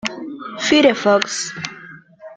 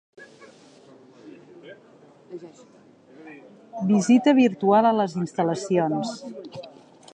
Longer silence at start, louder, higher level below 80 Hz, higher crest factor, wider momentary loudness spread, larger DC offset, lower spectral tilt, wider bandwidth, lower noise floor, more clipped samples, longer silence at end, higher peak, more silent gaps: second, 0.05 s vs 0.2 s; first, -16 LUFS vs -21 LUFS; first, -58 dBFS vs -74 dBFS; about the same, 20 dB vs 18 dB; second, 17 LU vs 24 LU; neither; second, -3 dB/octave vs -6 dB/octave; about the same, 9.4 kHz vs 9.6 kHz; second, -40 dBFS vs -52 dBFS; neither; second, 0 s vs 0.45 s; first, 0 dBFS vs -6 dBFS; neither